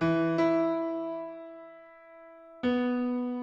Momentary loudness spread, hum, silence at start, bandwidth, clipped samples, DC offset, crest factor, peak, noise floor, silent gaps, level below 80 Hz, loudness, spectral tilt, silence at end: 24 LU; none; 0 s; 7 kHz; under 0.1%; under 0.1%; 14 dB; -16 dBFS; -51 dBFS; none; -66 dBFS; -29 LUFS; -8 dB/octave; 0 s